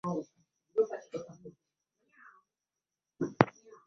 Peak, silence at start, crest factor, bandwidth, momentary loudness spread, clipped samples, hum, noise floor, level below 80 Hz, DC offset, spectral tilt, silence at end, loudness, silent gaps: -2 dBFS; 0.05 s; 34 dB; 7.2 kHz; 24 LU; under 0.1%; none; under -90 dBFS; -72 dBFS; under 0.1%; -6 dB/octave; 0.35 s; -34 LUFS; none